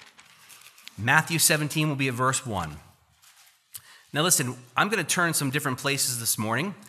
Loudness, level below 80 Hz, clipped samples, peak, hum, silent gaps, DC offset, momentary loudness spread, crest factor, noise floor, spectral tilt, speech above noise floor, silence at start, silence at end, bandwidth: -24 LUFS; -62 dBFS; under 0.1%; -4 dBFS; none; none; under 0.1%; 22 LU; 24 dB; -58 dBFS; -3 dB/octave; 33 dB; 0.5 s; 0 s; 15.5 kHz